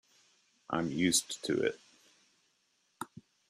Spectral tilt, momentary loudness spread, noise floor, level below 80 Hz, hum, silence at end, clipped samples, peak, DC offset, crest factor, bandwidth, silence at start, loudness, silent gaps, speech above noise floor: -3 dB/octave; 18 LU; -75 dBFS; -72 dBFS; none; 0.3 s; under 0.1%; -14 dBFS; under 0.1%; 22 dB; 15 kHz; 0.7 s; -32 LUFS; none; 43 dB